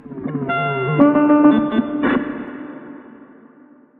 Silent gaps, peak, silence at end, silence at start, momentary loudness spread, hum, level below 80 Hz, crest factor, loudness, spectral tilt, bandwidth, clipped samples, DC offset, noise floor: none; 0 dBFS; 0.75 s; 0.05 s; 21 LU; none; -54 dBFS; 18 dB; -16 LUFS; -10.5 dB/octave; 3.8 kHz; under 0.1%; under 0.1%; -48 dBFS